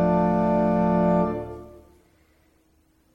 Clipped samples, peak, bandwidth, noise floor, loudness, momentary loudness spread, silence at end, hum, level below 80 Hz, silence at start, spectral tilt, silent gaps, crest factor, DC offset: under 0.1%; -10 dBFS; 5.6 kHz; -63 dBFS; -22 LUFS; 15 LU; 1.45 s; none; -46 dBFS; 0 s; -10 dB/octave; none; 14 dB; under 0.1%